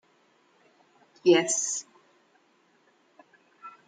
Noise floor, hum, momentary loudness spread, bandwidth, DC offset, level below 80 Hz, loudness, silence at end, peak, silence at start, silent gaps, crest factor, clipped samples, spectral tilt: -66 dBFS; none; 27 LU; 9.6 kHz; under 0.1%; -86 dBFS; -25 LUFS; 0.2 s; -8 dBFS; 1.25 s; none; 22 dB; under 0.1%; -2.5 dB/octave